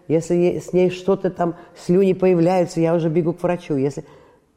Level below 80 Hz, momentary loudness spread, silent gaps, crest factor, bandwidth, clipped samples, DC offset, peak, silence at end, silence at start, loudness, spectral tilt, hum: -52 dBFS; 8 LU; none; 12 dB; 11 kHz; under 0.1%; under 0.1%; -6 dBFS; 0.55 s; 0.1 s; -19 LUFS; -7.5 dB/octave; none